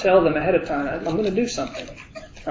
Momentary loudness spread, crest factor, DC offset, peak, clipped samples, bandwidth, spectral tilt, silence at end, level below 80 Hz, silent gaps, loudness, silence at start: 20 LU; 18 dB; under 0.1%; -4 dBFS; under 0.1%; 7.6 kHz; -5.5 dB/octave; 0 s; -46 dBFS; none; -22 LUFS; 0 s